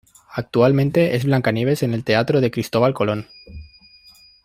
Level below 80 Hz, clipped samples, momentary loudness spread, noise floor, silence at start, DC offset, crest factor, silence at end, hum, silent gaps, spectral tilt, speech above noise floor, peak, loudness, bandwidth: -50 dBFS; under 0.1%; 13 LU; -49 dBFS; 0.3 s; under 0.1%; 18 dB; 0.8 s; none; none; -7 dB/octave; 31 dB; -2 dBFS; -19 LUFS; 15.5 kHz